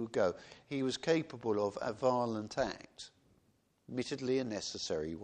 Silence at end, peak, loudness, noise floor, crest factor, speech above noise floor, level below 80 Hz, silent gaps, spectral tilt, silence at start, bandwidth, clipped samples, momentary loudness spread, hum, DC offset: 0 s; -18 dBFS; -36 LUFS; -73 dBFS; 20 dB; 37 dB; -66 dBFS; none; -5 dB/octave; 0 s; 9.8 kHz; under 0.1%; 13 LU; none; under 0.1%